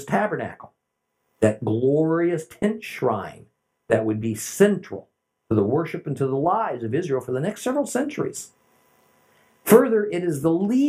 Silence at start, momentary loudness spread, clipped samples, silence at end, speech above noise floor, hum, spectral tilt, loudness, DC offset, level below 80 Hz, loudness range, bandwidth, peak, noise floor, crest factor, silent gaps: 0 s; 10 LU; under 0.1%; 0 s; 55 dB; none; -6.5 dB/octave; -23 LUFS; under 0.1%; -64 dBFS; 3 LU; 16 kHz; 0 dBFS; -77 dBFS; 22 dB; none